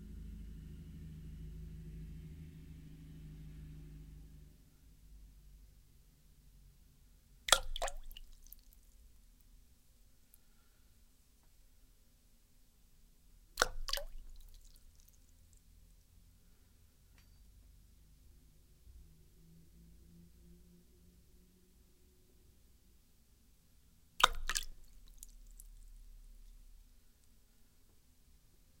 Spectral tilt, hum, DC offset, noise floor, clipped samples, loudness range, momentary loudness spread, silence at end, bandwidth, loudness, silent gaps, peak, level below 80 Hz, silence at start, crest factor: -1.5 dB/octave; none; under 0.1%; -66 dBFS; under 0.1%; 25 LU; 31 LU; 0.05 s; 16 kHz; -39 LUFS; none; -4 dBFS; -54 dBFS; 0 s; 42 dB